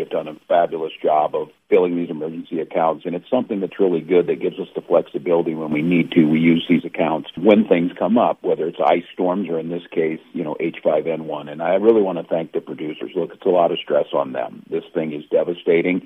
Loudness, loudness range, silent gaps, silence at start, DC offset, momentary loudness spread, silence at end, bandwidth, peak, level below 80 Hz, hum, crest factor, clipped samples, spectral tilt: -20 LUFS; 4 LU; none; 0 s; under 0.1%; 11 LU; 0.05 s; 3.9 kHz; 0 dBFS; -66 dBFS; none; 20 dB; under 0.1%; -9 dB/octave